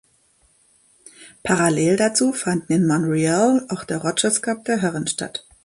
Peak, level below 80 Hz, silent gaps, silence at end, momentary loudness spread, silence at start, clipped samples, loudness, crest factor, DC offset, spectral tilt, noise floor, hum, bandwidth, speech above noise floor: -2 dBFS; -58 dBFS; none; 0.25 s; 7 LU; 1.2 s; under 0.1%; -20 LUFS; 18 dB; under 0.1%; -4.5 dB/octave; -60 dBFS; none; 11.5 kHz; 40 dB